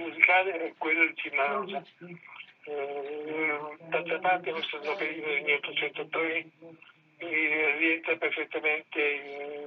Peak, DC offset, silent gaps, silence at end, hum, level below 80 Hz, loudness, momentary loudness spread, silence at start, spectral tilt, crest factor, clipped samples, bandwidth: -4 dBFS; under 0.1%; none; 0 s; none; under -90 dBFS; -28 LUFS; 15 LU; 0 s; -5.5 dB/octave; 26 dB; under 0.1%; 6.2 kHz